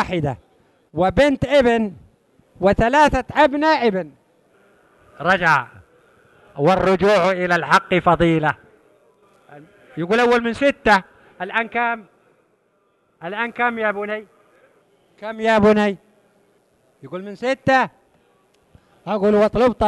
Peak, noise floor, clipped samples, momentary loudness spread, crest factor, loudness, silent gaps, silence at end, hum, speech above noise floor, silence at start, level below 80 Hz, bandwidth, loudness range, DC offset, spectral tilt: -2 dBFS; -63 dBFS; under 0.1%; 17 LU; 18 dB; -18 LUFS; none; 0 s; none; 46 dB; 0 s; -42 dBFS; 12 kHz; 7 LU; under 0.1%; -6 dB/octave